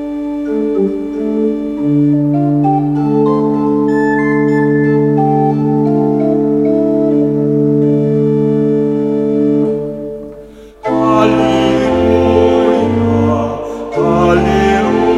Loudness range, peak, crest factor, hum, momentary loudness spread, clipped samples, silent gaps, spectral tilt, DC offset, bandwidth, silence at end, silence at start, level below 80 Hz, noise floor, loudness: 2 LU; 0 dBFS; 12 dB; none; 7 LU; under 0.1%; none; -8 dB/octave; under 0.1%; 8 kHz; 0 s; 0 s; -36 dBFS; -34 dBFS; -12 LUFS